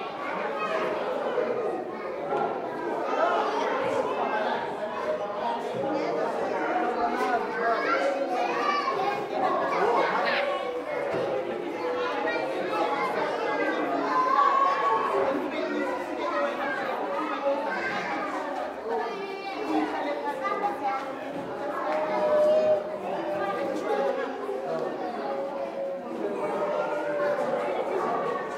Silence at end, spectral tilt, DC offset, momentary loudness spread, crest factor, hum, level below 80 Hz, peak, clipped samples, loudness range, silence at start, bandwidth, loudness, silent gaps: 0 s; -5 dB/octave; under 0.1%; 7 LU; 18 dB; none; -70 dBFS; -10 dBFS; under 0.1%; 5 LU; 0 s; 15 kHz; -28 LUFS; none